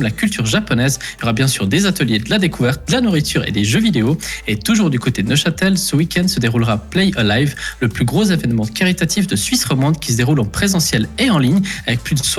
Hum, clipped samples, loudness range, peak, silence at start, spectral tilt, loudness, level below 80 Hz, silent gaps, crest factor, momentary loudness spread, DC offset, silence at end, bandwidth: none; under 0.1%; 1 LU; -4 dBFS; 0 s; -4.5 dB/octave; -16 LUFS; -36 dBFS; none; 12 dB; 4 LU; under 0.1%; 0 s; 16 kHz